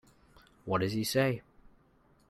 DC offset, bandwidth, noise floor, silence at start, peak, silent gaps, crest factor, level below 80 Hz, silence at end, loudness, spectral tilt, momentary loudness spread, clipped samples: under 0.1%; 15.5 kHz; -66 dBFS; 0.65 s; -16 dBFS; none; 18 dB; -64 dBFS; 0.9 s; -32 LUFS; -5 dB/octave; 12 LU; under 0.1%